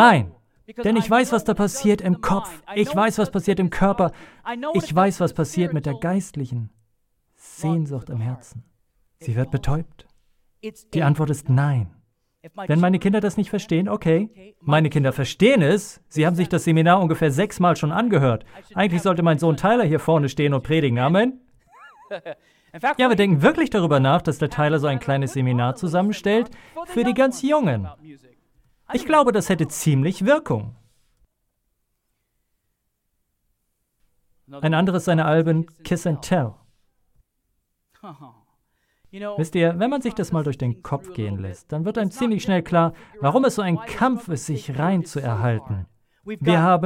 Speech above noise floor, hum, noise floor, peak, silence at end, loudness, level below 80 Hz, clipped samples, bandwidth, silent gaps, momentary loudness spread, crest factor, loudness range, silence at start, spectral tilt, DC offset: 54 dB; none; -74 dBFS; -2 dBFS; 0 s; -21 LUFS; -48 dBFS; under 0.1%; 16 kHz; none; 12 LU; 20 dB; 9 LU; 0 s; -6.5 dB/octave; under 0.1%